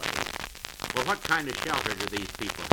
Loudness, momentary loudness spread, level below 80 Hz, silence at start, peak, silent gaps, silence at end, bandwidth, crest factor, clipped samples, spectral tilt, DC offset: -30 LUFS; 9 LU; -50 dBFS; 0 s; -2 dBFS; none; 0 s; over 20 kHz; 28 dB; under 0.1%; -2.5 dB/octave; under 0.1%